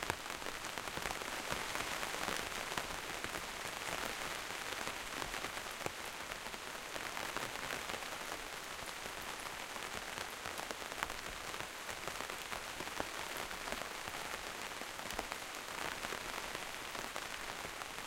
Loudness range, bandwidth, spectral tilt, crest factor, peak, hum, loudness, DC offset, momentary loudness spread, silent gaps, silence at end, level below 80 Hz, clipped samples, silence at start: 3 LU; 16.5 kHz; -1.5 dB/octave; 30 dB; -12 dBFS; none; -42 LUFS; under 0.1%; 4 LU; none; 0 s; -60 dBFS; under 0.1%; 0 s